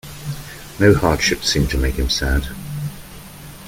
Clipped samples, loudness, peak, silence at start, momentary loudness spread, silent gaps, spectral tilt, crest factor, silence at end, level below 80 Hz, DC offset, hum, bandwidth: under 0.1%; -18 LUFS; 0 dBFS; 0.05 s; 21 LU; none; -4.5 dB/octave; 18 dB; 0 s; -26 dBFS; under 0.1%; none; 17 kHz